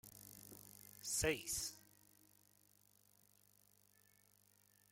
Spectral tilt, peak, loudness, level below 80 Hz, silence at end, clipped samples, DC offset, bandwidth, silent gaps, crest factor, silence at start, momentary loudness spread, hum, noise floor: -2 dB/octave; -26 dBFS; -42 LUFS; -66 dBFS; 3.1 s; under 0.1%; under 0.1%; 16.5 kHz; none; 24 dB; 0.05 s; 19 LU; 50 Hz at -75 dBFS; -73 dBFS